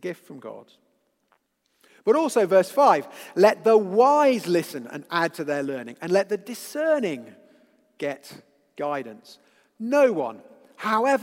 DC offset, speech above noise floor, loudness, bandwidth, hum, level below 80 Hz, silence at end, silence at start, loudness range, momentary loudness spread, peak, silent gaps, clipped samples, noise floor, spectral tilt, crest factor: under 0.1%; 46 dB; -23 LUFS; 16.5 kHz; none; -82 dBFS; 0 s; 0.05 s; 9 LU; 18 LU; -4 dBFS; none; under 0.1%; -69 dBFS; -5 dB/octave; 20 dB